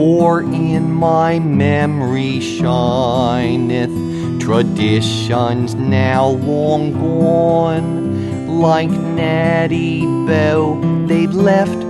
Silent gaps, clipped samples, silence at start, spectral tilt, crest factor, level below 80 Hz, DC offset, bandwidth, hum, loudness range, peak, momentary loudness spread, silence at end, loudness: none; under 0.1%; 0 s; -7 dB/octave; 12 dB; -46 dBFS; under 0.1%; 11.5 kHz; none; 1 LU; -2 dBFS; 5 LU; 0 s; -15 LUFS